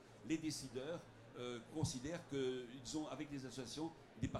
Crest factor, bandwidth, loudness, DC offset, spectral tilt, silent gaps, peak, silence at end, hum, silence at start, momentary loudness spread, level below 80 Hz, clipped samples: 18 dB; 15 kHz; -46 LUFS; under 0.1%; -5 dB/octave; none; -28 dBFS; 0 s; none; 0 s; 6 LU; -66 dBFS; under 0.1%